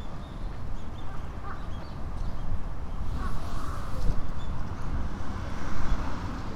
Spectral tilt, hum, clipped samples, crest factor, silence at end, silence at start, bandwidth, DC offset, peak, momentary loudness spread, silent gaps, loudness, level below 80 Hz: -6.5 dB/octave; none; under 0.1%; 16 dB; 0 s; 0 s; 7.4 kHz; under 0.1%; -10 dBFS; 6 LU; none; -37 LUFS; -32 dBFS